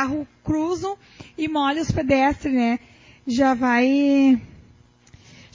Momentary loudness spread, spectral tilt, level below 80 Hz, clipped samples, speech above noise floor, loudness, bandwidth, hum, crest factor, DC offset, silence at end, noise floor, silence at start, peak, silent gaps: 12 LU; -6 dB/octave; -46 dBFS; under 0.1%; 32 dB; -21 LUFS; 7.6 kHz; none; 16 dB; under 0.1%; 1.1 s; -53 dBFS; 0 s; -6 dBFS; none